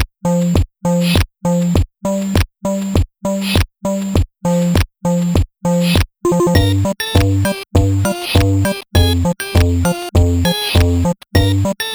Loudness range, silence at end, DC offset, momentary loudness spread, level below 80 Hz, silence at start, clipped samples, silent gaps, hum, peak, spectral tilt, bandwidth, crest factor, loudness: 3 LU; 0 s; under 0.1%; 4 LU; -24 dBFS; 0 s; under 0.1%; none; none; 0 dBFS; -6 dB/octave; over 20 kHz; 14 dB; -16 LUFS